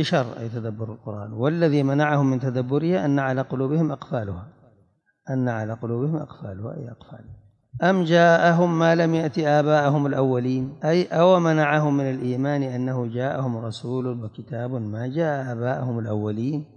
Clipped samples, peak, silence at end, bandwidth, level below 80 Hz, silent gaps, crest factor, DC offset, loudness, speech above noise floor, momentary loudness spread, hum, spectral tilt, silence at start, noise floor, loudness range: under 0.1%; -6 dBFS; 0.1 s; 8.8 kHz; -66 dBFS; none; 18 dB; under 0.1%; -22 LUFS; 41 dB; 15 LU; none; -7.5 dB/octave; 0 s; -63 dBFS; 8 LU